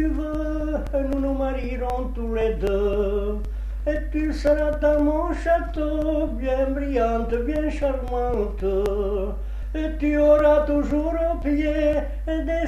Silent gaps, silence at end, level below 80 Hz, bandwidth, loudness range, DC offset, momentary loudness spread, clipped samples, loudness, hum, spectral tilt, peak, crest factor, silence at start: none; 0 s; -28 dBFS; 8.6 kHz; 4 LU; under 0.1%; 8 LU; under 0.1%; -23 LUFS; none; -8 dB/octave; -6 dBFS; 16 dB; 0 s